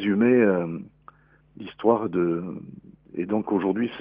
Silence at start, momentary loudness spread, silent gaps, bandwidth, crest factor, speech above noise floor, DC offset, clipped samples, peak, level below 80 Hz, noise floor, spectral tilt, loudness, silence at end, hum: 0 s; 20 LU; none; 5 kHz; 18 dB; 30 dB; under 0.1%; under 0.1%; -6 dBFS; -64 dBFS; -53 dBFS; -6.5 dB/octave; -24 LUFS; 0 s; none